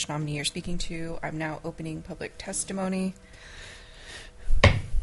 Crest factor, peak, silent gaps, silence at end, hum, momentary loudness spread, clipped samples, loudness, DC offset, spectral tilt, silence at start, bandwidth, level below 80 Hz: 26 dB; -2 dBFS; none; 0 s; none; 22 LU; under 0.1%; -29 LUFS; under 0.1%; -4.5 dB/octave; 0 s; 11.5 kHz; -34 dBFS